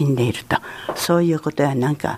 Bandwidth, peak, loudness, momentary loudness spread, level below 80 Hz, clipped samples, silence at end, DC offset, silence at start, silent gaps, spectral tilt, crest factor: 15.5 kHz; -4 dBFS; -20 LUFS; 6 LU; -52 dBFS; under 0.1%; 0 s; under 0.1%; 0 s; none; -6 dB/octave; 16 dB